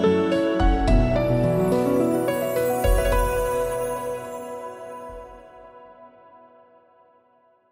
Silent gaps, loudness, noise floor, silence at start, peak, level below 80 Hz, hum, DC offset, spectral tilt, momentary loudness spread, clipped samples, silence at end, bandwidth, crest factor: none; -22 LUFS; -60 dBFS; 0 s; -6 dBFS; -30 dBFS; none; under 0.1%; -6.5 dB/octave; 16 LU; under 0.1%; 1.65 s; 16 kHz; 16 dB